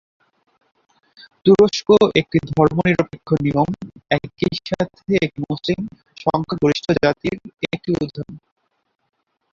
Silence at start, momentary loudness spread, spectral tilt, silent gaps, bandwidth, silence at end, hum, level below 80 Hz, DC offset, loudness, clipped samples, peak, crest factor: 1.45 s; 13 LU; -6.5 dB/octave; none; 7.4 kHz; 1.15 s; none; -48 dBFS; under 0.1%; -19 LUFS; under 0.1%; -2 dBFS; 18 dB